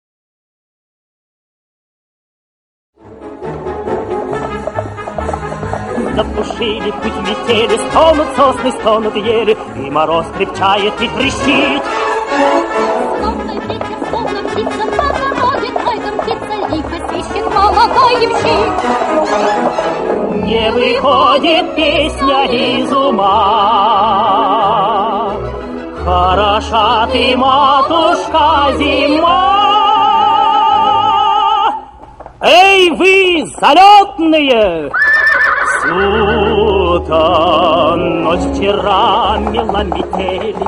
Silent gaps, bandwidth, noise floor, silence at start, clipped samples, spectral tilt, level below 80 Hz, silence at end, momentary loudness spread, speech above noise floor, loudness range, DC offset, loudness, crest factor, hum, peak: none; 12.5 kHz; -34 dBFS; 3.05 s; 0.1%; -4.5 dB/octave; -34 dBFS; 0 s; 10 LU; 23 dB; 10 LU; under 0.1%; -12 LUFS; 12 dB; none; 0 dBFS